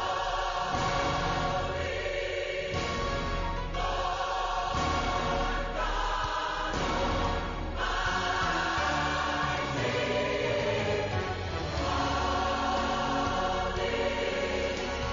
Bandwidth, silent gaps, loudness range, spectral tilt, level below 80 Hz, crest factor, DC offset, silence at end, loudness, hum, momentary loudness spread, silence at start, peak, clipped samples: 7.4 kHz; none; 2 LU; -3 dB/octave; -40 dBFS; 12 dB; under 0.1%; 0 s; -30 LUFS; none; 4 LU; 0 s; -18 dBFS; under 0.1%